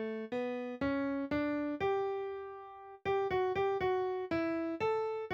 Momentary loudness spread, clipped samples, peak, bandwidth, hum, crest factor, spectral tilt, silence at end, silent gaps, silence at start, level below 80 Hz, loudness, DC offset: 9 LU; under 0.1%; -22 dBFS; 7 kHz; none; 14 dB; -7 dB/octave; 0 s; none; 0 s; -64 dBFS; -35 LUFS; under 0.1%